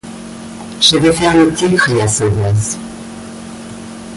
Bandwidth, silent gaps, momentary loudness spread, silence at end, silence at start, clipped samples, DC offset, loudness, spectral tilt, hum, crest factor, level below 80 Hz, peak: 11.5 kHz; none; 19 LU; 0 s; 0.05 s; under 0.1%; under 0.1%; -12 LUFS; -4 dB/octave; none; 14 dB; -38 dBFS; 0 dBFS